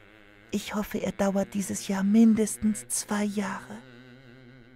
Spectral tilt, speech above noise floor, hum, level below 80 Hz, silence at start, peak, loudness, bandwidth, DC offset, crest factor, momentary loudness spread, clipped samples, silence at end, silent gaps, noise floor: -5 dB/octave; 27 dB; none; -58 dBFS; 0.5 s; -12 dBFS; -27 LUFS; 16 kHz; under 0.1%; 16 dB; 14 LU; under 0.1%; 0.25 s; none; -54 dBFS